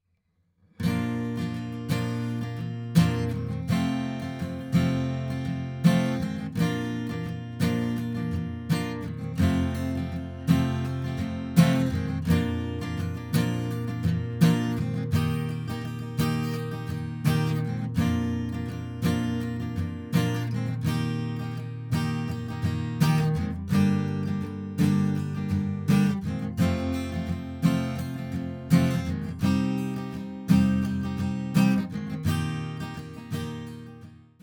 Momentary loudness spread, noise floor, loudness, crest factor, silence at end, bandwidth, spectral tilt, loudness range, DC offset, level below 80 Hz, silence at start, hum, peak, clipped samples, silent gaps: 10 LU; -71 dBFS; -27 LUFS; 22 dB; 0.25 s; over 20 kHz; -7 dB/octave; 3 LU; under 0.1%; -52 dBFS; 0.8 s; none; -6 dBFS; under 0.1%; none